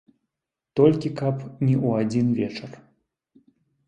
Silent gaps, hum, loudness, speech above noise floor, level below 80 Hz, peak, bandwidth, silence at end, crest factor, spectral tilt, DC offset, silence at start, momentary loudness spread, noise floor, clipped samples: none; none; -23 LUFS; 64 dB; -60 dBFS; -4 dBFS; 9.2 kHz; 1.1 s; 20 dB; -8.5 dB/octave; under 0.1%; 0.75 s; 11 LU; -86 dBFS; under 0.1%